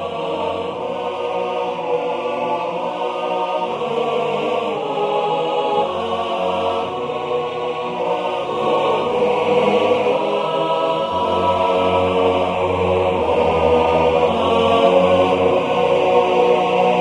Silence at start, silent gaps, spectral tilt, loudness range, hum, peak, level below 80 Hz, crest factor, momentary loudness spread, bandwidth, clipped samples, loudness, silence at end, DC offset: 0 s; none; -6 dB/octave; 6 LU; none; -2 dBFS; -48 dBFS; 16 dB; 8 LU; 10.5 kHz; under 0.1%; -18 LUFS; 0 s; under 0.1%